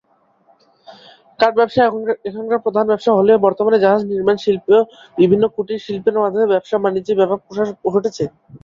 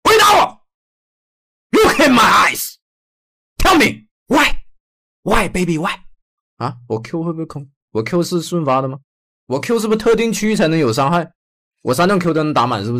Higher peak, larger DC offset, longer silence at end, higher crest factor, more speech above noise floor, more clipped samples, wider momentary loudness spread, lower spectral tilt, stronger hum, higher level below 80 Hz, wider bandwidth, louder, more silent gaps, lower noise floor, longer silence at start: about the same, -2 dBFS vs -4 dBFS; neither; about the same, 0.05 s vs 0 s; about the same, 14 dB vs 12 dB; second, 40 dB vs over 74 dB; neither; second, 9 LU vs 16 LU; first, -7 dB/octave vs -4.5 dB/octave; neither; second, -58 dBFS vs -34 dBFS; second, 7.4 kHz vs 16 kHz; about the same, -16 LUFS vs -15 LUFS; second, none vs 0.74-1.70 s, 2.82-3.56 s, 4.11-4.26 s, 4.80-5.23 s, 6.22-6.57 s, 7.76-7.88 s, 9.04-9.47 s, 11.35-11.71 s; second, -56 dBFS vs under -90 dBFS; first, 0.9 s vs 0.05 s